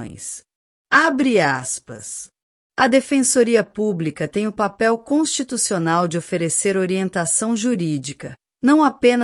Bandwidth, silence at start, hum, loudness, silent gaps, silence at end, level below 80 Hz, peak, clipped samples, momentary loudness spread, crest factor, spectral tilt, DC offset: 14 kHz; 0 s; none; -18 LUFS; 0.55-0.85 s, 2.43-2.70 s; 0 s; -60 dBFS; -2 dBFS; under 0.1%; 16 LU; 18 dB; -4 dB/octave; under 0.1%